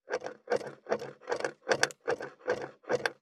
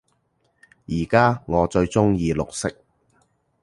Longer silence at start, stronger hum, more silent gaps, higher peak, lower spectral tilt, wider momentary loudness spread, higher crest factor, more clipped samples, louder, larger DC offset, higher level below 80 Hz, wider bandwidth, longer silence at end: second, 0.05 s vs 0.9 s; neither; neither; second, -8 dBFS vs -2 dBFS; second, -2.5 dB/octave vs -6.5 dB/octave; second, 8 LU vs 11 LU; about the same, 26 dB vs 22 dB; neither; second, -34 LUFS vs -21 LUFS; neither; second, -78 dBFS vs -42 dBFS; first, 15 kHz vs 11.5 kHz; second, 0.1 s vs 0.9 s